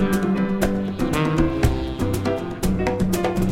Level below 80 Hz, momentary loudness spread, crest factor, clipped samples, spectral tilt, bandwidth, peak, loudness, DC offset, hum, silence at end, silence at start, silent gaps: -30 dBFS; 4 LU; 16 dB; under 0.1%; -6.5 dB/octave; 16.5 kHz; -4 dBFS; -22 LUFS; under 0.1%; none; 0 s; 0 s; none